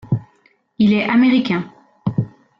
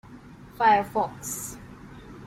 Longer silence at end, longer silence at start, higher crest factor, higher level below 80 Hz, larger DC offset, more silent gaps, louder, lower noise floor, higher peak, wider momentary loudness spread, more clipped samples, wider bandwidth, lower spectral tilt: first, 0.3 s vs 0 s; about the same, 0.05 s vs 0.1 s; second, 14 dB vs 20 dB; about the same, -52 dBFS vs -54 dBFS; neither; neither; first, -18 LUFS vs -25 LUFS; first, -58 dBFS vs -46 dBFS; about the same, -6 dBFS vs -8 dBFS; second, 11 LU vs 24 LU; neither; second, 6 kHz vs 16.5 kHz; first, -8.5 dB/octave vs -3.5 dB/octave